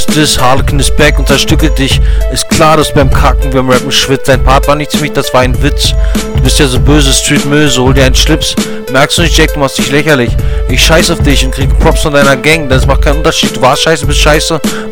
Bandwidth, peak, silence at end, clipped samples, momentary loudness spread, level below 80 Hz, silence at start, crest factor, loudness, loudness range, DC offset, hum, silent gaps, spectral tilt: 17.5 kHz; 0 dBFS; 0 s; 3%; 5 LU; -12 dBFS; 0 s; 6 dB; -8 LUFS; 1 LU; under 0.1%; none; none; -4 dB/octave